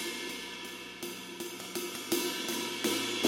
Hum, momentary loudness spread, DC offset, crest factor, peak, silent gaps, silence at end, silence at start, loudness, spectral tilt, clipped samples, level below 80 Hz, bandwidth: none; 9 LU; under 0.1%; 22 dB; -12 dBFS; none; 0 s; 0 s; -35 LUFS; -2 dB/octave; under 0.1%; -74 dBFS; 16.5 kHz